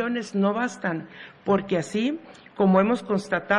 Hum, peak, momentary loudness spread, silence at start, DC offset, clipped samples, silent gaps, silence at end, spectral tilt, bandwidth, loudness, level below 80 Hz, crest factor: none; -8 dBFS; 14 LU; 0 s; under 0.1%; under 0.1%; none; 0 s; -6.5 dB/octave; 11 kHz; -25 LUFS; -64 dBFS; 16 dB